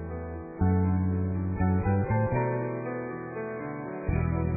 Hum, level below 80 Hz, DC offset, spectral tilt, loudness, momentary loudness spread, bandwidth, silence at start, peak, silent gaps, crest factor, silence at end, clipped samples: none; -42 dBFS; under 0.1%; -15 dB/octave; -29 LUFS; 10 LU; 2.6 kHz; 0 s; -14 dBFS; none; 14 dB; 0 s; under 0.1%